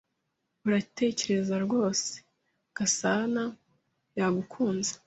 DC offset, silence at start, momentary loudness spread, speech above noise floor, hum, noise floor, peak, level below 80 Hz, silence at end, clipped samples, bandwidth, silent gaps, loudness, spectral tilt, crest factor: under 0.1%; 0.65 s; 10 LU; 52 dB; none; -80 dBFS; -14 dBFS; -70 dBFS; 0.1 s; under 0.1%; 8.2 kHz; none; -29 LUFS; -4 dB/octave; 18 dB